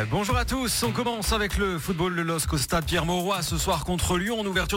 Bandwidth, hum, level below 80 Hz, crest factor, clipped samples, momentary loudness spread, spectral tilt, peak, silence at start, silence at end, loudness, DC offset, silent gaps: 17 kHz; none; -36 dBFS; 16 dB; under 0.1%; 2 LU; -4 dB/octave; -10 dBFS; 0 s; 0 s; -25 LUFS; under 0.1%; none